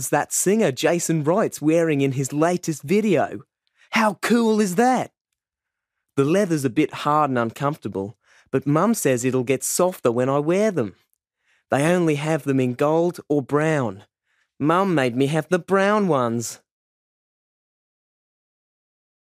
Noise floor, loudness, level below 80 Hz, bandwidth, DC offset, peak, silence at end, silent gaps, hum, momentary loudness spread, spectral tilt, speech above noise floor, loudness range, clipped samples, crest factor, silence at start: -85 dBFS; -21 LUFS; -68 dBFS; 15.5 kHz; under 0.1%; -4 dBFS; 2.7 s; 5.21-5.25 s; none; 8 LU; -5.5 dB/octave; 65 dB; 2 LU; under 0.1%; 18 dB; 0 s